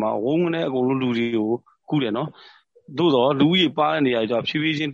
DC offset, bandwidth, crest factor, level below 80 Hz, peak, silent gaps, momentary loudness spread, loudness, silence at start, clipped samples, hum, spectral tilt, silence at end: under 0.1%; 7.4 kHz; 16 dB; -66 dBFS; -6 dBFS; none; 9 LU; -21 LUFS; 0 s; under 0.1%; none; -7 dB/octave; 0 s